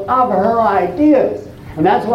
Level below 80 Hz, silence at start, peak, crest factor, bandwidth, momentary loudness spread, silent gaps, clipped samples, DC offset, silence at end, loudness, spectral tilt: -44 dBFS; 0 s; -2 dBFS; 10 dB; 6.6 kHz; 10 LU; none; under 0.1%; under 0.1%; 0 s; -14 LUFS; -8 dB/octave